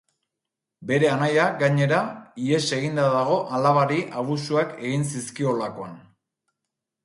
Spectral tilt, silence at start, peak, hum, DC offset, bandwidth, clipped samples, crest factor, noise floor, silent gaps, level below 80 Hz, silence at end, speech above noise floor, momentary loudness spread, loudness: -5.5 dB/octave; 0.8 s; -6 dBFS; none; under 0.1%; 11.5 kHz; under 0.1%; 18 dB; -85 dBFS; none; -68 dBFS; 1.05 s; 63 dB; 10 LU; -23 LUFS